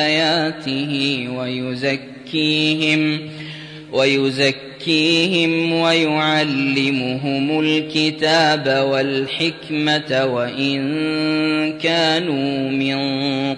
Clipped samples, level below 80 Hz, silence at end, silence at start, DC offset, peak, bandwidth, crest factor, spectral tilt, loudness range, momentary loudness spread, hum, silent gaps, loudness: under 0.1%; -62 dBFS; 0 s; 0 s; under 0.1%; -4 dBFS; 10.5 kHz; 14 dB; -5 dB/octave; 3 LU; 7 LU; none; none; -18 LUFS